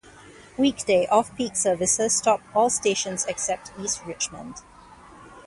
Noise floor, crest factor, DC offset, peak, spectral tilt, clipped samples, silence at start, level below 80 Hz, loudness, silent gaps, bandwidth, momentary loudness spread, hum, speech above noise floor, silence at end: -48 dBFS; 20 dB; under 0.1%; -6 dBFS; -2.5 dB/octave; under 0.1%; 0.05 s; -58 dBFS; -23 LUFS; none; 11.5 kHz; 10 LU; none; 24 dB; 0.05 s